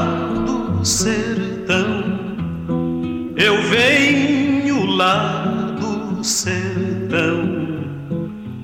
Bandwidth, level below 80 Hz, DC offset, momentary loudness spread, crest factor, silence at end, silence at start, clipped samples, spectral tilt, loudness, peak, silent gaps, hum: 16.5 kHz; -44 dBFS; under 0.1%; 11 LU; 12 dB; 0 s; 0 s; under 0.1%; -4 dB/octave; -18 LUFS; -6 dBFS; none; none